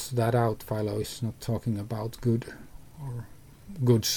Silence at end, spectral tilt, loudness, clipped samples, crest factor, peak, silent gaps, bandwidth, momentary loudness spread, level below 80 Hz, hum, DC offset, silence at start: 0 s; -5.5 dB/octave; -30 LUFS; under 0.1%; 18 dB; -10 dBFS; none; 19 kHz; 18 LU; -52 dBFS; none; under 0.1%; 0 s